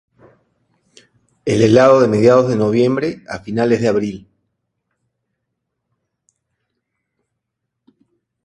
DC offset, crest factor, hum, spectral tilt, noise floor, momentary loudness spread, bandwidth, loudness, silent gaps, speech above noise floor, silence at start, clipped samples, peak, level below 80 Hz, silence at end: under 0.1%; 18 dB; none; -7 dB/octave; -77 dBFS; 16 LU; 10.5 kHz; -14 LUFS; none; 64 dB; 1.45 s; under 0.1%; 0 dBFS; -54 dBFS; 4.25 s